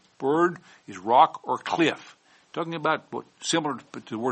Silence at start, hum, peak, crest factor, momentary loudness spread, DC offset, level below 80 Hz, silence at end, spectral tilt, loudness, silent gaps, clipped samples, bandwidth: 0.2 s; none; -4 dBFS; 22 dB; 18 LU; under 0.1%; -74 dBFS; 0 s; -4 dB/octave; -25 LUFS; none; under 0.1%; 8.4 kHz